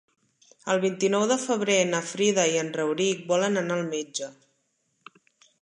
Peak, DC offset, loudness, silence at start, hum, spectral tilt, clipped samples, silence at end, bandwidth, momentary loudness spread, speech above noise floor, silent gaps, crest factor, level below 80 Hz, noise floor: -8 dBFS; under 0.1%; -25 LUFS; 0.65 s; none; -3.5 dB/octave; under 0.1%; 1.3 s; 11 kHz; 9 LU; 48 dB; none; 18 dB; -78 dBFS; -73 dBFS